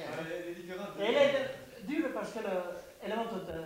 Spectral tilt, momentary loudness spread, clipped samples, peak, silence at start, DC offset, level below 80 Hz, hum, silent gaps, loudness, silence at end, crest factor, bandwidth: -5 dB/octave; 14 LU; under 0.1%; -14 dBFS; 0 s; under 0.1%; -66 dBFS; none; none; -34 LUFS; 0 s; 20 dB; 16 kHz